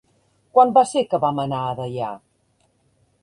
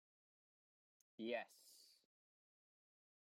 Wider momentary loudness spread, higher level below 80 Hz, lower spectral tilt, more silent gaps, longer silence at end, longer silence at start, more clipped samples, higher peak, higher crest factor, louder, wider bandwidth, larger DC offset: second, 14 LU vs 21 LU; first, -62 dBFS vs under -90 dBFS; first, -6 dB/octave vs -3.5 dB/octave; neither; second, 1.05 s vs 1.4 s; second, 0.55 s vs 1.2 s; neither; first, -2 dBFS vs -32 dBFS; about the same, 20 dB vs 24 dB; first, -20 LUFS vs -49 LUFS; second, 11 kHz vs 16 kHz; neither